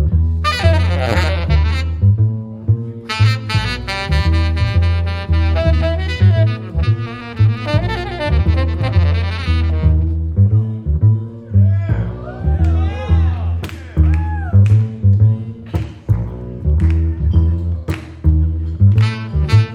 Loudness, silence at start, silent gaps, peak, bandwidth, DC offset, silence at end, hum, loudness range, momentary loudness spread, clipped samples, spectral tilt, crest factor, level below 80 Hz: -16 LUFS; 0 s; none; -2 dBFS; 10 kHz; under 0.1%; 0 s; none; 1 LU; 7 LU; under 0.1%; -7.5 dB/octave; 14 dB; -20 dBFS